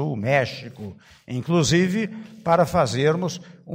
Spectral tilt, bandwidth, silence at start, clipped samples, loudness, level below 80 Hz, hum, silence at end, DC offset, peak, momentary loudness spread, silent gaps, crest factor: -5.5 dB/octave; 16 kHz; 0 s; under 0.1%; -22 LUFS; -52 dBFS; none; 0 s; under 0.1%; -6 dBFS; 17 LU; none; 16 dB